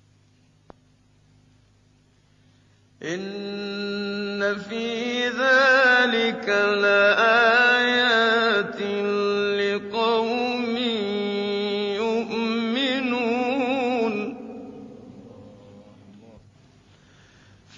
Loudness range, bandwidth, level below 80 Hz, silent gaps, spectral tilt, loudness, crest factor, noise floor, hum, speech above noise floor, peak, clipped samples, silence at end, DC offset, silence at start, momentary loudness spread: 15 LU; 7.6 kHz; -66 dBFS; none; -4 dB/octave; -21 LUFS; 18 dB; -59 dBFS; none; 38 dB; -6 dBFS; under 0.1%; 1.45 s; under 0.1%; 3 s; 14 LU